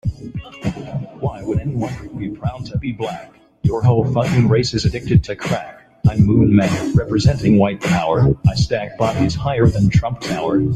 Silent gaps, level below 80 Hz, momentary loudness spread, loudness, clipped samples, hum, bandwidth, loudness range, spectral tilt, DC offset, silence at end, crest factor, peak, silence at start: none; -34 dBFS; 12 LU; -18 LUFS; under 0.1%; none; 11.5 kHz; 8 LU; -7 dB/octave; under 0.1%; 0 s; 14 dB; -2 dBFS; 0.05 s